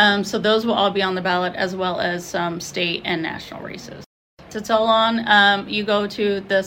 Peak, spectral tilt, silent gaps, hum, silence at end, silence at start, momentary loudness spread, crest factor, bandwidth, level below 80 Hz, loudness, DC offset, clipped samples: 0 dBFS; -4 dB/octave; 4.06-4.37 s; none; 0 s; 0 s; 16 LU; 20 dB; 16.5 kHz; -56 dBFS; -19 LUFS; under 0.1%; under 0.1%